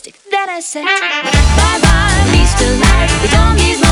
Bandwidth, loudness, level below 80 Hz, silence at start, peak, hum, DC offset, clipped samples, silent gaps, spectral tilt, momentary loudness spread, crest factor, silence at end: 13 kHz; -11 LUFS; -14 dBFS; 0.05 s; 0 dBFS; none; under 0.1%; under 0.1%; none; -4 dB/octave; 7 LU; 10 dB; 0 s